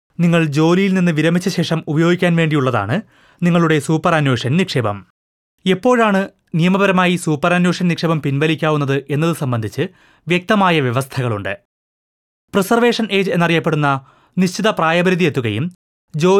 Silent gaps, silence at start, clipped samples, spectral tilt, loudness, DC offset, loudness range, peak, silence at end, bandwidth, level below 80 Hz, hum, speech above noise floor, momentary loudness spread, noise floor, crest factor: 5.10-5.58 s, 11.65-12.48 s, 15.75-16.08 s; 0.2 s; under 0.1%; -6 dB/octave; -16 LUFS; under 0.1%; 2 LU; -2 dBFS; 0 s; 14 kHz; -58 dBFS; none; over 74 dB; 9 LU; under -90 dBFS; 14 dB